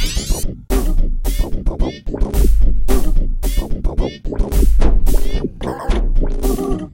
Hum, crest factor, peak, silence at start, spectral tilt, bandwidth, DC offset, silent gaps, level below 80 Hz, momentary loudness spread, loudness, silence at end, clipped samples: none; 14 dB; 0 dBFS; 0 s; -5.5 dB/octave; 16.5 kHz; under 0.1%; none; -14 dBFS; 7 LU; -20 LUFS; 0.05 s; under 0.1%